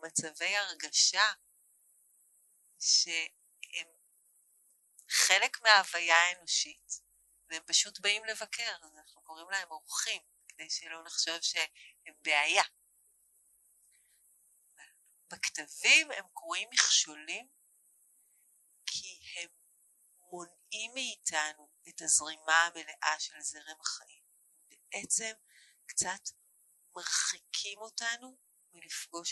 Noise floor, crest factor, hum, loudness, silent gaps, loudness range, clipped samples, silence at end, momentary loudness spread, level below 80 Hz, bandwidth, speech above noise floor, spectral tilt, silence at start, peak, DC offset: -69 dBFS; 32 dB; none; -30 LUFS; none; 10 LU; under 0.1%; 0 s; 18 LU; -84 dBFS; 12 kHz; 36 dB; 2 dB/octave; 0 s; -2 dBFS; under 0.1%